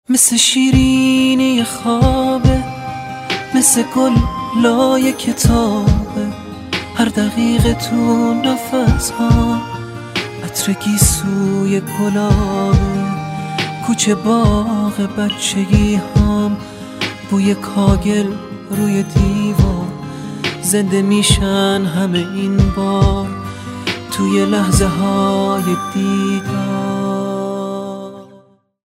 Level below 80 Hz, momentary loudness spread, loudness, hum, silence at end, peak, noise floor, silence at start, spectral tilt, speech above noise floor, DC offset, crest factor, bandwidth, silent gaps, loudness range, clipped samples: -26 dBFS; 10 LU; -15 LUFS; none; 0.55 s; 0 dBFS; -47 dBFS; 0.1 s; -5 dB/octave; 33 dB; under 0.1%; 14 dB; 16 kHz; none; 3 LU; under 0.1%